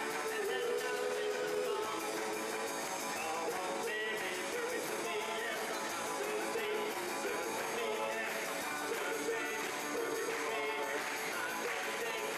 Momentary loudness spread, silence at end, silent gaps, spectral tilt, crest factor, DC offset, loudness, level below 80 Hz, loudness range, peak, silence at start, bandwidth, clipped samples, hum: 2 LU; 0 s; none; -1.5 dB/octave; 12 dB; under 0.1%; -37 LUFS; -78 dBFS; 0 LU; -26 dBFS; 0 s; 15 kHz; under 0.1%; none